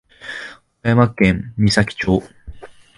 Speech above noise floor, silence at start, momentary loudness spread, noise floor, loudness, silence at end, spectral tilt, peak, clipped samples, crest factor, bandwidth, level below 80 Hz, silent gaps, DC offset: 21 dB; 0.25 s; 16 LU; -37 dBFS; -17 LUFS; 0.3 s; -6 dB/octave; 0 dBFS; under 0.1%; 18 dB; 11.5 kHz; -38 dBFS; none; under 0.1%